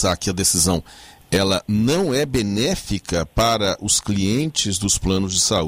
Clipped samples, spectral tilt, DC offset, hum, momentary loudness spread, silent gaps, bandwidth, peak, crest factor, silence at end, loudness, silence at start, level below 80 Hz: under 0.1%; -3.5 dB/octave; under 0.1%; none; 6 LU; none; 16 kHz; -6 dBFS; 14 dB; 0 s; -19 LUFS; 0 s; -36 dBFS